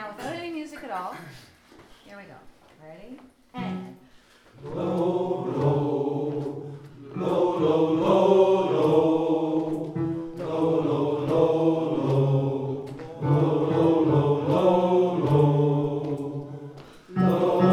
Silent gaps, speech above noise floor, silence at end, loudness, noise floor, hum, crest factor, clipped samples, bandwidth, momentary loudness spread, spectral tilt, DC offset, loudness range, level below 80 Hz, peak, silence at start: none; 22 dB; 0 s; -24 LUFS; -54 dBFS; none; 18 dB; under 0.1%; 11 kHz; 16 LU; -9 dB/octave; under 0.1%; 16 LU; -62 dBFS; -6 dBFS; 0 s